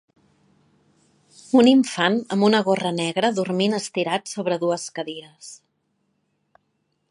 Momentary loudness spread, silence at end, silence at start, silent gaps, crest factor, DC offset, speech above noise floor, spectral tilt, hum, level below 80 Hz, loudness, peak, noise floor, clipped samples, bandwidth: 17 LU; 1.55 s; 1.55 s; none; 20 dB; under 0.1%; 51 dB; -5 dB/octave; none; -70 dBFS; -21 LUFS; -2 dBFS; -72 dBFS; under 0.1%; 11.5 kHz